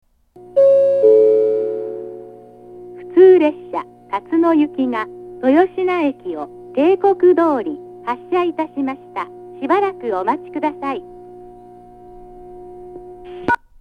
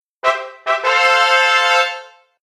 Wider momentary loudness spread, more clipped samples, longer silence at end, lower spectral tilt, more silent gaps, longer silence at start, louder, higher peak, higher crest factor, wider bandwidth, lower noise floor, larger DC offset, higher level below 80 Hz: first, 22 LU vs 9 LU; neither; second, 0.25 s vs 0.4 s; first, -7 dB/octave vs 2 dB/octave; neither; first, 0.55 s vs 0.25 s; about the same, -16 LUFS vs -14 LUFS; about the same, 0 dBFS vs -2 dBFS; about the same, 16 dB vs 14 dB; second, 5 kHz vs 14 kHz; first, -41 dBFS vs -34 dBFS; neither; first, -56 dBFS vs -66 dBFS